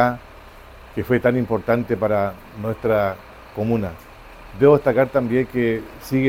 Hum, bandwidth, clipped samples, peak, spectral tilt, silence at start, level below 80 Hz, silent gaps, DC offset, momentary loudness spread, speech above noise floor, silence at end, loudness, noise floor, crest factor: none; 16.5 kHz; under 0.1%; -2 dBFS; -8 dB/octave; 0 s; -46 dBFS; none; under 0.1%; 16 LU; 23 dB; 0 s; -20 LUFS; -42 dBFS; 18 dB